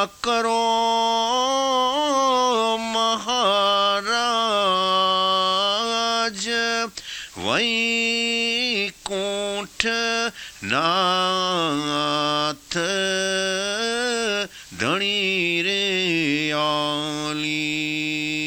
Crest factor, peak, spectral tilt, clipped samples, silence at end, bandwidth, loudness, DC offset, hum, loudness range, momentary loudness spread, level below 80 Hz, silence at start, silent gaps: 22 dB; 0 dBFS; -2.5 dB/octave; under 0.1%; 0 s; 20 kHz; -21 LUFS; under 0.1%; none; 3 LU; 6 LU; -58 dBFS; 0 s; none